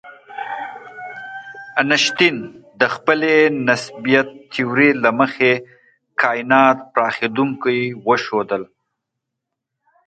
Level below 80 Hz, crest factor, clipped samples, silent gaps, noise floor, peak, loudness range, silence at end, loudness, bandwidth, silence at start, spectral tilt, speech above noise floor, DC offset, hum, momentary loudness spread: -66 dBFS; 18 dB; under 0.1%; none; -80 dBFS; 0 dBFS; 3 LU; 1.4 s; -17 LUFS; 9 kHz; 0.05 s; -4.5 dB/octave; 63 dB; under 0.1%; none; 18 LU